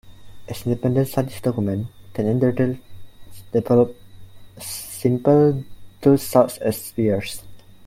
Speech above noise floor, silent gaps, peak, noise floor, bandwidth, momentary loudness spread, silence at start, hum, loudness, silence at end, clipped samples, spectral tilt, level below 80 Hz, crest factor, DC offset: 20 dB; none; -2 dBFS; -39 dBFS; 16.5 kHz; 15 LU; 0.05 s; none; -21 LUFS; 0 s; under 0.1%; -7 dB/octave; -50 dBFS; 20 dB; under 0.1%